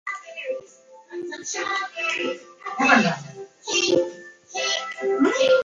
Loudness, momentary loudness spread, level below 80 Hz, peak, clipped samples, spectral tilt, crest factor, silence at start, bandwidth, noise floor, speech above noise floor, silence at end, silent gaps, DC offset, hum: -23 LUFS; 17 LU; -70 dBFS; -4 dBFS; under 0.1%; -3 dB/octave; 20 dB; 0.05 s; 7.8 kHz; -49 dBFS; 27 dB; 0 s; none; under 0.1%; none